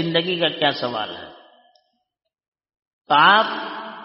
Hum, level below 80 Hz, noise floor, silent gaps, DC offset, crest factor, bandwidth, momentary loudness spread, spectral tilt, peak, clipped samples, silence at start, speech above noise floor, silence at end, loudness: none; -68 dBFS; -79 dBFS; 2.48-2.52 s, 2.87-3.05 s; under 0.1%; 22 dB; 5.8 kHz; 17 LU; -1 dB/octave; 0 dBFS; under 0.1%; 0 s; 60 dB; 0 s; -18 LUFS